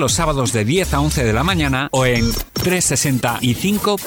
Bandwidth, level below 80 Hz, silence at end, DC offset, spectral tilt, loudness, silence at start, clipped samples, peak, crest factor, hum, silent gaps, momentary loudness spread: 19 kHz; -30 dBFS; 0 s; under 0.1%; -4 dB/octave; -17 LUFS; 0 s; under 0.1%; -6 dBFS; 10 dB; none; none; 3 LU